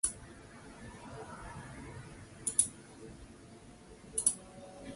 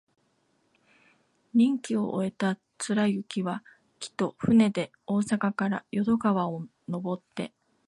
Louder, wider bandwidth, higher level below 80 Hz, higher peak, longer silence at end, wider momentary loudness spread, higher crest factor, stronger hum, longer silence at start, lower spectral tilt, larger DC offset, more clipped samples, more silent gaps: second, -35 LUFS vs -28 LUFS; about the same, 12 kHz vs 11.5 kHz; first, -60 dBFS vs -66 dBFS; about the same, -10 dBFS vs -12 dBFS; second, 0 s vs 0.4 s; first, 23 LU vs 14 LU; first, 30 dB vs 16 dB; neither; second, 0.05 s vs 1.55 s; second, -2 dB/octave vs -6 dB/octave; neither; neither; neither